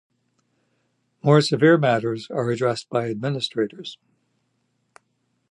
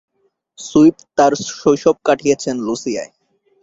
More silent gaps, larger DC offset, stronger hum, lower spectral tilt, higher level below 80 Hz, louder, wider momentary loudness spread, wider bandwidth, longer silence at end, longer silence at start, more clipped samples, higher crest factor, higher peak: neither; neither; neither; first, -6.5 dB/octave vs -5 dB/octave; second, -68 dBFS vs -54 dBFS; second, -21 LUFS vs -16 LUFS; about the same, 11 LU vs 12 LU; first, 11 kHz vs 7.8 kHz; first, 1.55 s vs 0.55 s; first, 1.25 s vs 0.6 s; neither; about the same, 20 dB vs 16 dB; second, -4 dBFS vs 0 dBFS